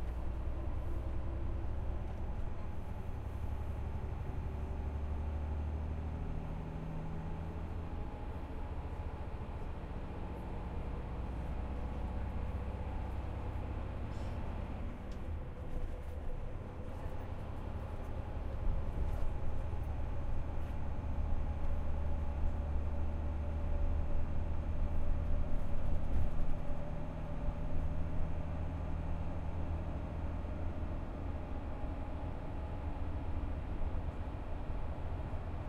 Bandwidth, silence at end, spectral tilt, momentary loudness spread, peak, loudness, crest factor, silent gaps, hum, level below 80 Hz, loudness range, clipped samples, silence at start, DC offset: 4.5 kHz; 0 s; -8.5 dB/octave; 5 LU; -20 dBFS; -42 LUFS; 16 dB; none; none; -38 dBFS; 4 LU; under 0.1%; 0 s; under 0.1%